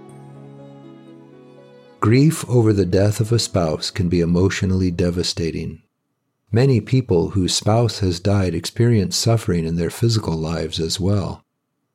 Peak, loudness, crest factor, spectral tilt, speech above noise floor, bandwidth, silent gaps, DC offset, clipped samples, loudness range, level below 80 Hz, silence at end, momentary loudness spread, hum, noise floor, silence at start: -2 dBFS; -19 LUFS; 16 dB; -6 dB/octave; 56 dB; 14.5 kHz; none; under 0.1%; under 0.1%; 2 LU; -44 dBFS; 0.55 s; 7 LU; none; -73 dBFS; 0 s